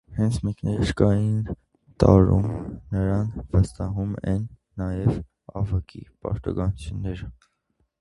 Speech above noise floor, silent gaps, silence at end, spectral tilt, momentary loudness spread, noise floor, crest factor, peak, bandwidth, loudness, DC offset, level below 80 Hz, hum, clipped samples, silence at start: 48 dB; none; 0.7 s; -8.5 dB/octave; 14 LU; -71 dBFS; 24 dB; 0 dBFS; 11.5 kHz; -24 LUFS; under 0.1%; -36 dBFS; none; under 0.1%; 0.1 s